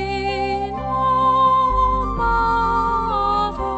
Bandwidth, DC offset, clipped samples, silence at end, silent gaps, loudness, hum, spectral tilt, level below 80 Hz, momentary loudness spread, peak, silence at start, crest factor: 8.4 kHz; under 0.1%; under 0.1%; 0 s; none; -19 LUFS; none; -6.5 dB/octave; -30 dBFS; 7 LU; -6 dBFS; 0 s; 12 dB